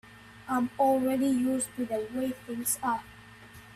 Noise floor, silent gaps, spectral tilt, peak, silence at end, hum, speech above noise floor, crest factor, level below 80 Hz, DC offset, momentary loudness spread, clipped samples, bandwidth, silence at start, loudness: -50 dBFS; none; -4 dB/octave; -14 dBFS; 0 s; none; 22 dB; 16 dB; -64 dBFS; under 0.1%; 23 LU; under 0.1%; 15 kHz; 0.05 s; -29 LUFS